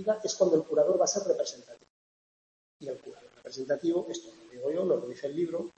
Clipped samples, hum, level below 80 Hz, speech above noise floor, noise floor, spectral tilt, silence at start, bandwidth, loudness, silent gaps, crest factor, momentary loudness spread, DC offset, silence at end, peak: under 0.1%; none; -76 dBFS; over 60 dB; under -90 dBFS; -4 dB/octave; 0 s; 8.6 kHz; -29 LUFS; 1.90-2.80 s; 20 dB; 19 LU; under 0.1%; 0.1 s; -12 dBFS